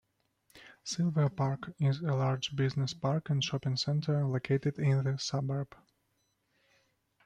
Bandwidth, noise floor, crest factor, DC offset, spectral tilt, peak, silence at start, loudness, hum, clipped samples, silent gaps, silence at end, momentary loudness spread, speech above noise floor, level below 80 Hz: 9 kHz; -77 dBFS; 16 dB; under 0.1%; -6 dB/octave; -18 dBFS; 0.55 s; -32 LUFS; none; under 0.1%; none; 1.6 s; 4 LU; 46 dB; -68 dBFS